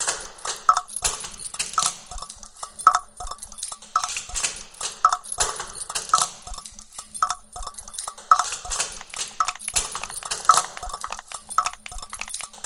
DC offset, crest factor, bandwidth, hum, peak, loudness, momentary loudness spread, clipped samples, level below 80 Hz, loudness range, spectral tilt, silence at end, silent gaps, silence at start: under 0.1%; 26 dB; 16.5 kHz; none; 0 dBFS; -24 LUFS; 16 LU; under 0.1%; -46 dBFS; 3 LU; 0.5 dB/octave; 0 s; none; 0 s